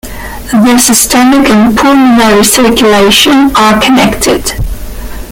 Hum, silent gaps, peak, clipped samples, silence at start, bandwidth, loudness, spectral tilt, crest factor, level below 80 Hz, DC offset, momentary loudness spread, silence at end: none; none; 0 dBFS; 0.7%; 0.05 s; over 20 kHz; -5 LUFS; -3 dB/octave; 6 dB; -24 dBFS; under 0.1%; 16 LU; 0 s